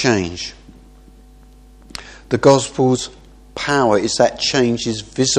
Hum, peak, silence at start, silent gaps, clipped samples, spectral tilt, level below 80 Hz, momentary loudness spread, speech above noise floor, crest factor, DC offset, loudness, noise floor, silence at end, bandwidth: none; 0 dBFS; 0 s; none; under 0.1%; -4 dB/octave; -44 dBFS; 20 LU; 28 dB; 18 dB; under 0.1%; -17 LUFS; -44 dBFS; 0 s; 11.5 kHz